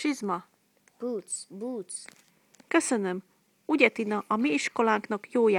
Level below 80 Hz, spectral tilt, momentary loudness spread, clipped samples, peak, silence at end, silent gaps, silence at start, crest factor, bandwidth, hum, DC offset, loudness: -78 dBFS; -4 dB/octave; 14 LU; under 0.1%; -4 dBFS; 0 s; none; 0 s; 24 dB; 16 kHz; none; under 0.1%; -28 LUFS